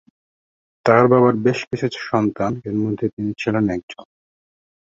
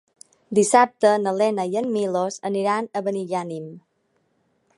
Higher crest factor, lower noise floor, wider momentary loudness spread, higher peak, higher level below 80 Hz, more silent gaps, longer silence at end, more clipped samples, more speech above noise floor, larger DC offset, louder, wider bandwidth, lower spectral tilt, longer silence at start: about the same, 18 dB vs 20 dB; first, under -90 dBFS vs -68 dBFS; about the same, 11 LU vs 11 LU; about the same, -2 dBFS vs -2 dBFS; first, -54 dBFS vs -76 dBFS; first, 1.67-1.71 s, 3.13-3.17 s, 3.83-3.88 s vs none; about the same, 0.95 s vs 1 s; neither; first, over 72 dB vs 47 dB; neither; first, -19 LUFS vs -22 LUFS; second, 7.8 kHz vs 11.5 kHz; first, -7.5 dB/octave vs -4.5 dB/octave; first, 0.85 s vs 0.5 s